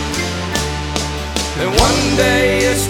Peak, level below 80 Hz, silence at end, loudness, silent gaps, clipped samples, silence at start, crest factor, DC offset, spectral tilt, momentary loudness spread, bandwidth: 0 dBFS; -26 dBFS; 0 s; -16 LUFS; none; under 0.1%; 0 s; 16 dB; under 0.1%; -3.5 dB/octave; 7 LU; 19 kHz